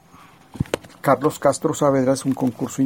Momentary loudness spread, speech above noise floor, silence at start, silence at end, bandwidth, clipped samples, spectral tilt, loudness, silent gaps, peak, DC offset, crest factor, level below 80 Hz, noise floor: 9 LU; 29 dB; 0.55 s; 0 s; 18 kHz; under 0.1%; -6 dB/octave; -21 LUFS; none; -2 dBFS; under 0.1%; 18 dB; -48 dBFS; -48 dBFS